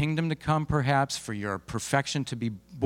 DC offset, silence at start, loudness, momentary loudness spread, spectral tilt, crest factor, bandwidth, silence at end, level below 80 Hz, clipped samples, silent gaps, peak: under 0.1%; 0 s; -29 LUFS; 8 LU; -5 dB/octave; 20 dB; 16 kHz; 0 s; -52 dBFS; under 0.1%; none; -8 dBFS